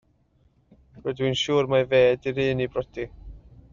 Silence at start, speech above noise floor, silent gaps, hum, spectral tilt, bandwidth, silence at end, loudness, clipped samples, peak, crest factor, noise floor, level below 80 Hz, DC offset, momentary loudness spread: 0.95 s; 40 dB; none; none; -4 dB/octave; 7.4 kHz; 0.35 s; -24 LUFS; under 0.1%; -8 dBFS; 18 dB; -63 dBFS; -50 dBFS; under 0.1%; 15 LU